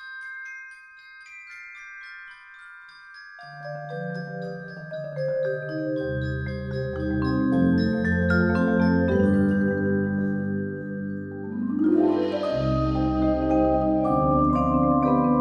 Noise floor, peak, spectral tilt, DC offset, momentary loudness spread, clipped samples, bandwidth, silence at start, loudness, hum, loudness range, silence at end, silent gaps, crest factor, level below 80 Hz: -47 dBFS; -8 dBFS; -9 dB/octave; under 0.1%; 21 LU; under 0.1%; 9.4 kHz; 0 s; -24 LUFS; none; 16 LU; 0 s; none; 16 dB; -40 dBFS